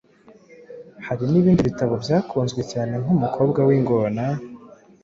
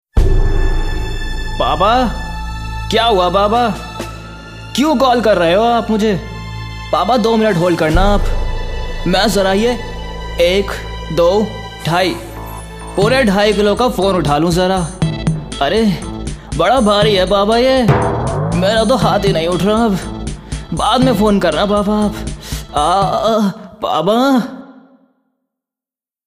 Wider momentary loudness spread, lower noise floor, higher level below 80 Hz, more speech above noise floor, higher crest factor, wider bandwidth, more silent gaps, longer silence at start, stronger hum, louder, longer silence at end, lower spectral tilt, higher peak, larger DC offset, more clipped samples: about the same, 14 LU vs 14 LU; second, -51 dBFS vs under -90 dBFS; second, -50 dBFS vs -24 dBFS; second, 31 dB vs over 77 dB; about the same, 16 dB vs 14 dB; second, 7.6 kHz vs 15.5 kHz; neither; first, 0.7 s vs 0.15 s; neither; second, -21 LUFS vs -14 LUFS; second, 0.35 s vs 1.45 s; first, -8 dB/octave vs -5.5 dB/octave; second, -6 dBFS vs 0 dBFS; neither; neither